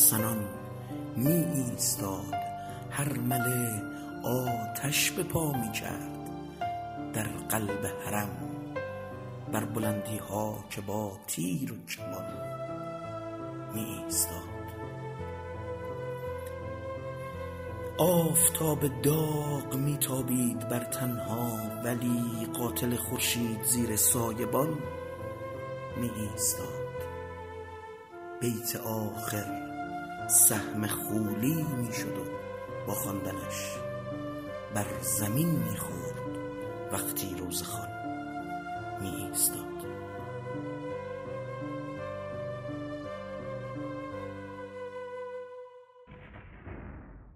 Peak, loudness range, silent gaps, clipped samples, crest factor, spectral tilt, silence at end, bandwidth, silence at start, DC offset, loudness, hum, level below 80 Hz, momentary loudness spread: -6 dBFS; 11 LU; none; under 0.1%; 26 dB; -4 dB/octave; 0 s; 16 kHz; 0 s; under 0.1%; -32 LUFS; none; -58 dBFS; 13 LU